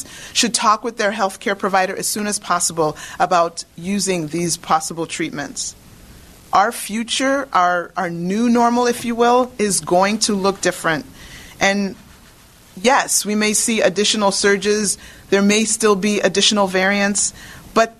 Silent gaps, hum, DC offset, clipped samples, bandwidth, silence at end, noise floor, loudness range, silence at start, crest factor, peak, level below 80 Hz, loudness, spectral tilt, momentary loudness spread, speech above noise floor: none; none; under 0.1%; under 0.1%; 13.5 kHz; 0.05 s; -46 dBFS; 5 LU; 0 s; 18 dB; -2 dBFS; -50 dBFS; -17 LUFS; -3 dB/octave; 9 LU; 28 dB